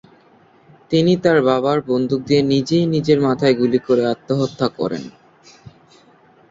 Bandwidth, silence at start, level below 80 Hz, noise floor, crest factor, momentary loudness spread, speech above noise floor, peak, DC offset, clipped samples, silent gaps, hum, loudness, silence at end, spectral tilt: 7.8 kHz; 0.9 s; -56 dBFS; -51 dBFS; 16 dB; 7 LU; 35 dB; -2 dBFS; under 0.1%; under 0.1%; none; none; -17 LUFS; 1.4 s; -7 dB/octave